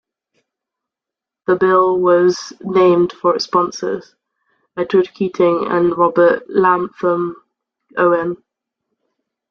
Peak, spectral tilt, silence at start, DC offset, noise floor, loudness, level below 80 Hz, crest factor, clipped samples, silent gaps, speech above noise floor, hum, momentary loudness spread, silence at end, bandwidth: -2 dBFS; -6 dB/octave; 1.5 s; under 0.1%; -86 dBFS; -16 LUFS; -60 dBFS; 16 dB; under 0.1%; none; 71 dB; none; 12 LU; 1.15 s; 7 kHz